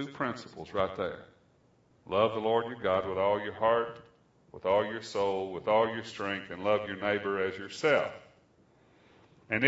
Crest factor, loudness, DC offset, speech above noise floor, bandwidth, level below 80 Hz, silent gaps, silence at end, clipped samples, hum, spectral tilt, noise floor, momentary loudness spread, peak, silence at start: 24 dB; -31 LUFS; under 0.1%; 35 dB; 8 kHz; -68 dBFS; none; 0 s; under 0.1%; none; -5.5 dB/octave; -65 dBFS; 10 LU; -8 dBFS; 0 s